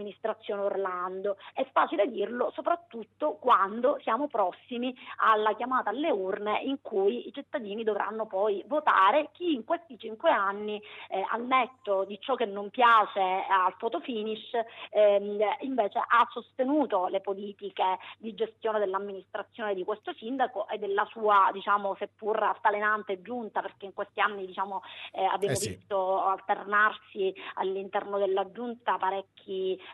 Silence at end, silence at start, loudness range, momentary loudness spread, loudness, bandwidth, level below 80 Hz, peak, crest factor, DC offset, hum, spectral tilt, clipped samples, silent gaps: 0 s; 0 s; 4 LU; 11 LU; -29 LUFS; 11.5 kHz; -78 dBFS; -10 dBFS; 18 dB; under 0.1%; none; -4 dB/octave; under 0.1%; none